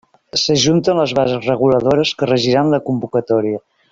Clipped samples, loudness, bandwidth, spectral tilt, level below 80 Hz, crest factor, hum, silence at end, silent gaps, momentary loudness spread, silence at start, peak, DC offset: under 0.1%; -15 LUFS; 7.8 kHz; -5 dB/octave; -52 dBFS; 14 dB; none; 0.35 s; none; 6 LU; 0.35 s; -2 dBFS; under 0.1%